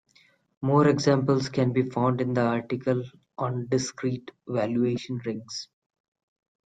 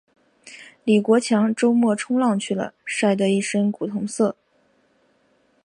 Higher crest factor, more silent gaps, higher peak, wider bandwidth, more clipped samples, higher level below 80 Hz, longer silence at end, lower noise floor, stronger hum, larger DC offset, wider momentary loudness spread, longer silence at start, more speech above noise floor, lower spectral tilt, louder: about the same, 18 dB vs 16 dB; neither; about the same, -8 dBFS vs -6 dBFS; second, 9.2 kHz vs 11 kHz; neither; first, -64 dBFS vs -72 dBFS; second, 1 s vs 1.35 s; about the same, -62 dBFS vs -63 dBFS; neither; neither; first, 13 LU vs 9 LU; first, 0.6 s vs 0.45 s; second, 37 dB vs 43 dB; about the same, -6.5 dB/octave vs -5.5 dB/octave; second, -26 LUFS vs -21 LUFS